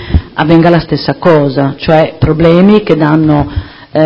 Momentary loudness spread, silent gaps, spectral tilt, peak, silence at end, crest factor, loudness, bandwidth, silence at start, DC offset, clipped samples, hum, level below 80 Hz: 8 LU; none; -9.5 dB/octave; 0 dBFS; 0 s; 8 dB; -9 LUFS; 6.4 kHz; 0 s; under 0.1%; 2%; none; -24 dBFS